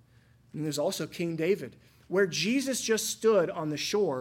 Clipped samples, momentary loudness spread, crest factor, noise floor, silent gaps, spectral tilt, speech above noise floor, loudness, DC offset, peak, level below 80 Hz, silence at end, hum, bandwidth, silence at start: under 0.1%; 8 LU; 16 dB; -61 dBFS; none; -4 dB/octave; 32 dB; -29 LUFS; under 0.1%; -14 dBFS; -70 dBFS; 0 s; none; 17 kHz; 0.55 s